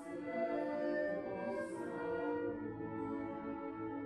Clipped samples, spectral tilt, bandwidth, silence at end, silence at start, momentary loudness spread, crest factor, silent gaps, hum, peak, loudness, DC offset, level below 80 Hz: under 0.1%; -7.5 dB/octave; 11.5 kHz; 0 s; 0 s; 6 LU; 14 dB; none; none; -26 dBFS; -41 LUFS; under 0.1%; -70 dBFS